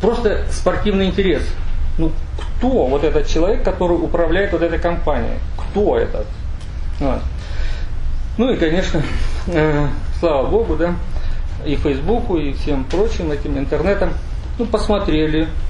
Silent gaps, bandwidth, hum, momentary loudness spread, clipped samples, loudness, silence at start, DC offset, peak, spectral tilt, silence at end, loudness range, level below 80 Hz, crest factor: none; 10 kHz; none; 10 LU; under 0.1%; -19 LUFS; 0 s; under 0.1%; -2 dBFS; -7 dB/octave; 0 s; 3 LU; -22 dBFS; 14 dB